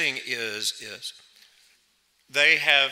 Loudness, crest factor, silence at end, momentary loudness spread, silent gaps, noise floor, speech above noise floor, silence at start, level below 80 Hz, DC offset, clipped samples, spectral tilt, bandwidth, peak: -22 LUFS; 20 dB; 0 s; 18 LU; none; -67 dBFS; 42 dB; 0 s; -80 dBFS; under 0.1%; under 0.1%; 0 dB/octave; 16 kHz; -6 dBFS